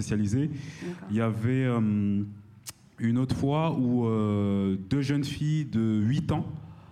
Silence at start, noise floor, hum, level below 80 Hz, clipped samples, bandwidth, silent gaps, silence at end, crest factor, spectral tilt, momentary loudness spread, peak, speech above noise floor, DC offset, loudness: 0 s; -47 dBFS; none; -54 dBFS; under 0.1%; 15 kHz; none; 0.05 s; 12 dB; -7.5 dB/octave; 13 LU; -14 dBFS; 21 dB; under 0.1%; -28 LUFS